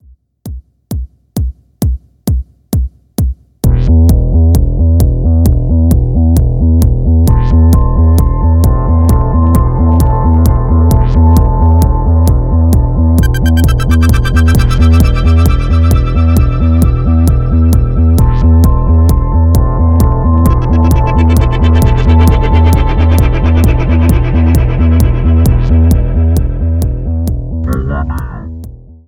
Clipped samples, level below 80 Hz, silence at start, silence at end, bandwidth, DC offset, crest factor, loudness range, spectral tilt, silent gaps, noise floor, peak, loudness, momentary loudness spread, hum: 0.4%; -12 dBFS; 0.45 s; 0.3 s; 16 kHz; under 0.1%; 8 dB; 3 LU; -8 dB/octave; none; -30 dBFS; 0 dBFS; -10 LUFS; 8 LU; none